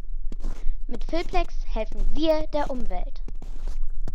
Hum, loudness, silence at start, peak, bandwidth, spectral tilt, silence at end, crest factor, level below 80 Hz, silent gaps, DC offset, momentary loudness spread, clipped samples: none; -31 LUFS; 0 s; -8 dBFS; 6 kHz; -6.5 dB/octave; 0 s; 14 dB; -26 dBFS; none; under 0.1%; 14 LU; under 0.1%